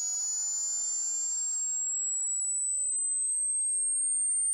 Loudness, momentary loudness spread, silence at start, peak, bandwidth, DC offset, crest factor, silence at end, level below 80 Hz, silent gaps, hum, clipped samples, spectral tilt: -27 LUFS; 3 LU; 0 s; -24 dBFS; 16 kHz; under 0.1%; 6 dB; 0 s; under -90 dBFS; none; none; under 0.1%; 5.5 dB/octave